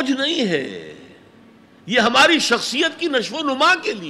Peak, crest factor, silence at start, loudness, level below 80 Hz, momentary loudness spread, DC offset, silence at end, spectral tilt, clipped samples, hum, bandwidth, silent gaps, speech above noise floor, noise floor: -2 dBFS; 18 dB; 0 s; -17 LUFS; -68 dBFS; 10 LU; under 0.1%; 0 s; -2.5 dB/octave; under 0.1%; none; 14.5 kHz; none; 30 dB; -48 dBFS